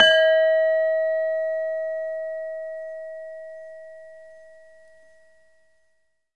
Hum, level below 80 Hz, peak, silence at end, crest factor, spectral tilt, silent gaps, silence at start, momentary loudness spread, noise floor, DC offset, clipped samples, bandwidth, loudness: none; -72 dBFS; -2 dBFS; 2 s; 22 dB; -0.5 dB/octave; none; 0 s; 24 LU; -71 dBFS; 0.2%; under 0.1%; 8.8 kHz; -23 LUFS